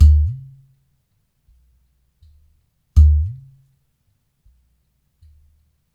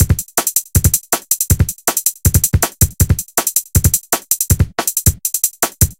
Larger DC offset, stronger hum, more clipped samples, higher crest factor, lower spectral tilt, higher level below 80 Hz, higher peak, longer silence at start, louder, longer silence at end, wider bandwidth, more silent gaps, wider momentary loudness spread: neither; neither; neither; about the same, 20 dB vs 16 dB; first, -8.5 dB/octave vs -3.5 dB/octave; about the same, -22 dBFS vs -24 dBFS; about the same, 0 dBFS vs 0 dBFS; about the same, 0 s vs 0 s; second, -17 LUFS vs -14 LUFS; first, 2.6 s vs 0.05 s; second, 1.3 kHz vs over 20 kHz; neither; first, 25 LU vs 3 LU